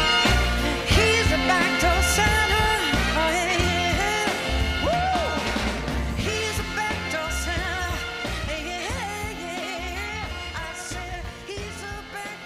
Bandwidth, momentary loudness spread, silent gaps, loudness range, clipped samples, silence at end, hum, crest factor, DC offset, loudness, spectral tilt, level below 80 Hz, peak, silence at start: 15.5 kHz; 13 LU; none; 10 LU; under 0.1%; 0 s; none; 16 dB; under 0.1%; -23 LUFS; -3.5 dB/octave; -32 dBFS; -8 dBFS; 0 s